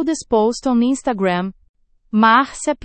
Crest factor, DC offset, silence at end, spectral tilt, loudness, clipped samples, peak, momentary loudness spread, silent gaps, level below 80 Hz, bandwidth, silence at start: 16 dB; under 0.1%; 0.1 s; -4.5 dB/octave; -17 LUFS; under 0.1%; -2 dBFS; 9 LU; 1.69-1.74 s; -50 dBFS; 8.8 kHz; 0 s